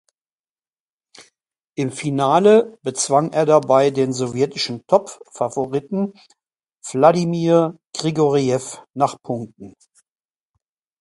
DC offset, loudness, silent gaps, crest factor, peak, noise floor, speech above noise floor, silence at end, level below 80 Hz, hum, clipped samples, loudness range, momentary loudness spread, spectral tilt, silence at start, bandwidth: under 0.1%; -19 LUFS; 7.85-7.90 s; 20 dB; 0 dBFS; under -90 dBFS; over 72 dB; 1.3 s; -64 dBFS; none; under 0.1%; 4 LU; 14 LU; -5.5 dB/octave; 1.2 s; 11.5 kHz